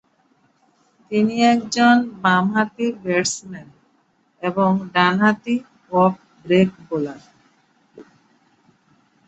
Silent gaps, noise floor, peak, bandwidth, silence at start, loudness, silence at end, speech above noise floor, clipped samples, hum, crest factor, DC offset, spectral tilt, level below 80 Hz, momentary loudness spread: none; -62 dBFS; -2 dBFS; 8.2 kHz; 1.1 s; -19 LUFS; 1.25 s; 44 dB; under 0.1%; none; 18 dB; under 0.1%; -5 dB/octave; -64 dBFS; 11 LU